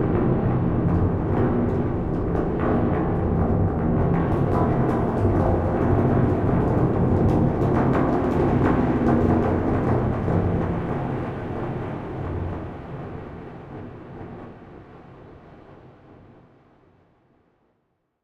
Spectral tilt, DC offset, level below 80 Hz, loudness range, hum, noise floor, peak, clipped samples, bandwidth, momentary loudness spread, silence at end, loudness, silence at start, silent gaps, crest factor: -10.5 dB/octave; under 0.1%; -34 dBFS; 16 LU; none; -72 dBFS; -6 dBFS; under 0.1%; 6.4 kHz; 16 LU; 2.35 s; -22 LUFS; 0 s; none; 16 dB